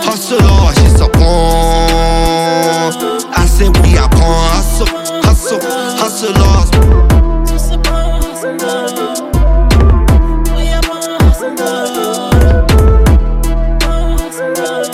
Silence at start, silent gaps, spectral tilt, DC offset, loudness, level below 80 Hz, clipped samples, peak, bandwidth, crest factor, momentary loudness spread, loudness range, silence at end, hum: 0 s; none; -5.5 dB/octave; under 0.1%; -11 LUFS; -10 dBFS; under 0.1%; 0 dBFS; 15.5 kHz; 8 dB; 8 LU; 2 LU; 0 s; none